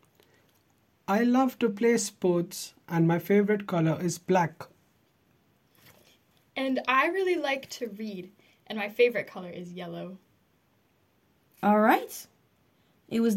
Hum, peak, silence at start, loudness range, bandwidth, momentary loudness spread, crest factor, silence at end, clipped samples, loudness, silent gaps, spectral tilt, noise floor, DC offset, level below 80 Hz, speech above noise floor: none; -10 dBFS; 1.1 s; 6 LU; 16.5 kHz; 17 LU; 20 dB; 0 s; under 0.1%; -27 LUFS; none; -5.5 dB/octave; -68 dBFS; under 0.1%; -74 dBFS; 41 dB